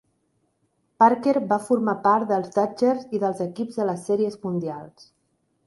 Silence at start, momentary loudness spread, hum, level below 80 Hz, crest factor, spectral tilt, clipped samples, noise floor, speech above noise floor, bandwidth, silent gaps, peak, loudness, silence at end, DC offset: 1 s; 10 LU; none; -70 dBFS; 20 dB; -7 dB/octave; under 0.1%; -70 dBFS; 48 dB; 11.5 kHz; none; -4 dBFS; -23 LUFS; 0.8 s; under 0.1%